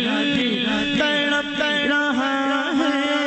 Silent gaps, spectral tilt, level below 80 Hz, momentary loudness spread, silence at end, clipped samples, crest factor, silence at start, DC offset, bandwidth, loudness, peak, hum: none; -4 dB/octave; -54 dBFS; 2 LU; 0 s; under 0.1%; 10 dB; 0 s; under 0.1%; 8.4 kHz; -20 LUFS; -10 dBFS; none